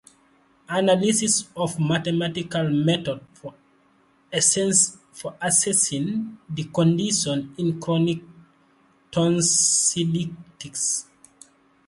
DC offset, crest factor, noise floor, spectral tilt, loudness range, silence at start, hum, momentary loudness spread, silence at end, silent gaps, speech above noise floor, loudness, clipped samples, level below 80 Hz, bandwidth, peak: under 0.1%; 20 dB; -60 dBFS; -3.5 dB/octave; 3 LU; 0.7 s; none; 15 LU; 0.85 s; none; 38 dB; -21 LUFS; under 0.1%; -62 dBFS; 11.5 kHz; -4 dBFS